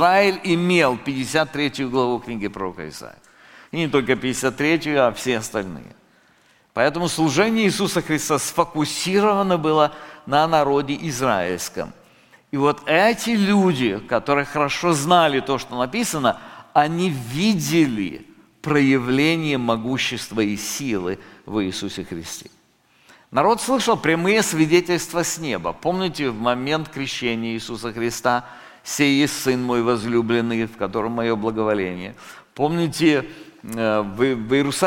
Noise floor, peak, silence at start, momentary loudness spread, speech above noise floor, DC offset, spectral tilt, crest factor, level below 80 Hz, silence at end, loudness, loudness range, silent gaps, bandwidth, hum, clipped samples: -58 dBFS; -2 dBFS; 0 s; 12 LU; 38 dB; under 0.1%; -4.5 dB/octave; 18 dB; -52 dBFS; 0 s; -21 LUFS; 4 LU; none; 17 kHz; none; under 0.1%